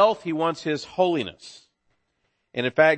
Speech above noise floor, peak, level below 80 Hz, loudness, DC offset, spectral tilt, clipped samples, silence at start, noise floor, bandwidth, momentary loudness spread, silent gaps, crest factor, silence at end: 51 dB; -6 dBFS; -66 dBFS; -25 LUFS; under 0.1%; -5.5 dB/octave; under 0.1%; 0 s; -74 dBFS; 8.8 kHz; 16 LU; none; 18 dB; 0 s